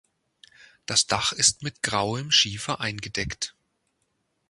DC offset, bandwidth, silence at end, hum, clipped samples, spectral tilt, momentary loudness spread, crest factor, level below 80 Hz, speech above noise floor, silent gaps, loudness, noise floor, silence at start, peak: under 0.1%; 11.5 kHz; 1 s; none; under 0.1%; -1.5 dB/octave; 11 LU; 24 dB; -52 dBFS; 49 dB; none; -24 LUFS; -74 dBFS; 0.6 s; -4 dBFS